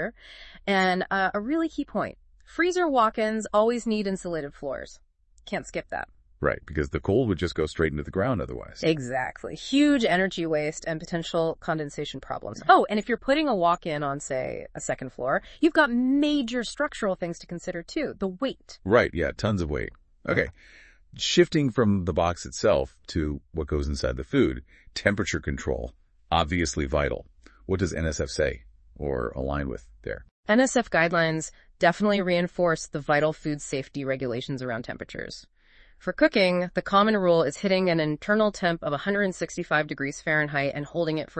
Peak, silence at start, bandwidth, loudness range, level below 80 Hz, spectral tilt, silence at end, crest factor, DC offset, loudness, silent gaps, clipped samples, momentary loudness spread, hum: -4 dBFS; 0 s; 8.8 kHz; 5 LU; -44 dBFS; -5 dB/octave; 0 s; 24 dB; under 0.1%; -26 LUFS; 30.31-30.43 s; under 0.1%; 13 LU; none